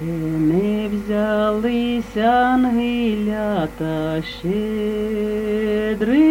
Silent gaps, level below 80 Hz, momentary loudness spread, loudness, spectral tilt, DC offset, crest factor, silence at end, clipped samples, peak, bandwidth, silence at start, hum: none; -42 dBFS; 7 LU; -20 LUFS; -7 dB/octave; under 0.1%; 14 dB; 0 s; under 0.1%; -6 dBFS; 17 kHz; 0 s; none